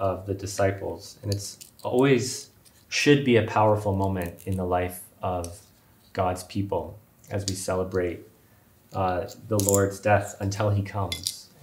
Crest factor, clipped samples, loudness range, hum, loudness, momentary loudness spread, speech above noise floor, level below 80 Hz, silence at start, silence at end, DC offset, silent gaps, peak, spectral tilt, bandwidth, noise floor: 24 dB; under 0.1%; 7 LU; none; -26 LUFS; 14 LU; 32 dB; -56 dBFS; 0 s; 0.2 s; under 0.1%; none; -4 dBFS; -5 dB/octave; 16 kHz; -57 dBFS